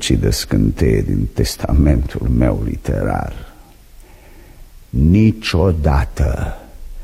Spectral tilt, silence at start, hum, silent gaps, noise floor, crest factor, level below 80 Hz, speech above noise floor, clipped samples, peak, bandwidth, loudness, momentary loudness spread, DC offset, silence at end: -6.5 dB/octave; 0 s; none; none; -41 dBFS; 16 dB; -22 dBFS; 26 dB; under 0.1%; -2 dBFS; 15.5 kHz; -17 LUFS; 10 LU; under 0.1%; 0 s